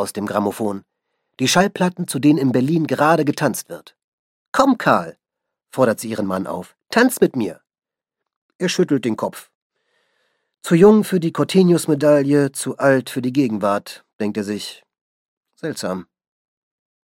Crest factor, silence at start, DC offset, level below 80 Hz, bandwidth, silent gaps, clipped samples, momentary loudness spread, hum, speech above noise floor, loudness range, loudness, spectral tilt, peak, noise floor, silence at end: 18 dB; 0 s; under 0.1%; -60 dBFS; 16.5 kHz; 4.04-4.52 s, 8.36-8.49 s, 8.55-8.59 s, 9.55-9.70 s, 14.13-14.19 s, 15.01-15.41 s; under 0.1%; 14 LU; none; 65 dB; 8 LU; -18 LUFS; -5.5 dB/octave; -2 dBFS; -83 dBFS; 1.05 s